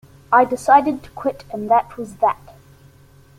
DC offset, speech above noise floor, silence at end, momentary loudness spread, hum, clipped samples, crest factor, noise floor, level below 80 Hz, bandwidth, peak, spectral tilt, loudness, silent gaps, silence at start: under 0.1%; 31 dB; 1.05 s; 14 LU; none; under 0.1%; 18 dB; -49 dBFS; -54 dBFS; 15.5 kHz; -2 dBFS; -5.5 dB/octave; -18 LUFS; none; 0.3 s